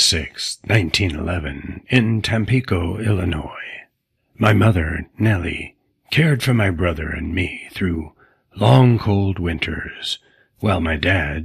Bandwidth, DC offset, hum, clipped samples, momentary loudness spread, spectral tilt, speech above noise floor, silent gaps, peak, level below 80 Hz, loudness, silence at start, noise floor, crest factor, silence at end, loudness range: 14.5 kHz; under 0.1%; none; under 0.1%; 13 LU; -5.5 dB/octave; 49 dB; none; 0 dBFS; -36 dBFS; -19 LUFS; 0 s; -67 dBFS; 20 dB; 0 s; 2 LU